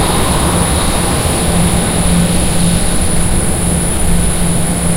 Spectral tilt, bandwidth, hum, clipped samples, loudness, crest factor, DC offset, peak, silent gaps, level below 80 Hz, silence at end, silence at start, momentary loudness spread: -4 dB/octave; 16 kHz; none; under 0.1%; -13 LUFS; 12 dB; under 0.1%; 0 dBFS; none; -18 dBFS; 0 s; 0 s; 2 LU